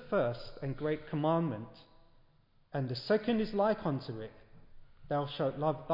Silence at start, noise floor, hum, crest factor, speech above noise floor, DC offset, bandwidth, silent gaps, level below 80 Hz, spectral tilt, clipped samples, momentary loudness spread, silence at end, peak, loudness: 0 s; -66 dBFS; none; 16 dB; 33 dB; under 0.1%; 5.6 kHz; none; -58 dBFS; -6 dB/octave; under 0.1%; 12 LU; 0 s; -18 dBFS; -34 LUFS